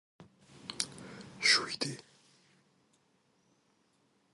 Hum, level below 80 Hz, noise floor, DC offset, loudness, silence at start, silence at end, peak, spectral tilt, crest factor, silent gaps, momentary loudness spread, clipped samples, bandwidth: none; -78 dBFS; -73 dBFS; under 0.1%; -31 LUFS; 0.2 s; 2.35 s; -10 dBFS; -1 dB/octave; 28 dB; none; 23 LU; under 0.1%; 11.5 kHz